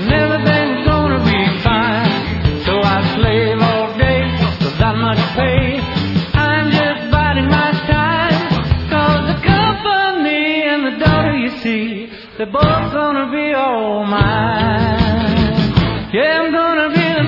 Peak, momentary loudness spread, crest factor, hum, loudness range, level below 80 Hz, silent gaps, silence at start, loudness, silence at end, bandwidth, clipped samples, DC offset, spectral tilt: 0 dBFS; 4 LU; 14 dB; none; 2 LU; -30 dBFS; none; 0 s; -14 LUFS; 0 s; 5.8 kHz; under 0.1%; under 0.1%; -8 dB/octave